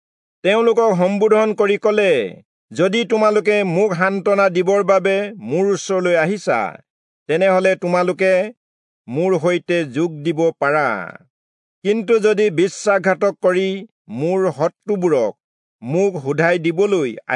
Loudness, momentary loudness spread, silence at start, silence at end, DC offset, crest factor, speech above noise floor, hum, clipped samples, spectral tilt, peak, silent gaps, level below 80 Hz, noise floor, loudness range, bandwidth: -17 LUFS; 8 LU; 0.45 s; 0 s; under 0.1%; 16 dB; over 73 dB; none; under 0.1%; -5.5 dB/octave; -2 dBFS; 2.45-2.68 s, 6.90-7.26 s, 8.57-9.05 s, 11.30-11.82 s, 13.91-14.05 s, 15.44-15.79 s; -74 dBFS; under -90 dBFS; 3 LU; 10.5 kHz